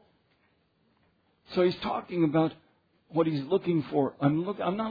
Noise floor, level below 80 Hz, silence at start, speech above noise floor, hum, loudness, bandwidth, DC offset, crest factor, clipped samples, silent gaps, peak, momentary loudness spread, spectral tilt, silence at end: -70 dBFS; -66 dBFS; 1.5 s; 42 dB; none; -28 LUFS; 5 kHz; under 0.1%; 18 dB; under 0.1%; none; -12 dBFS; 6 LU; -9.5 dB/octave; 0 s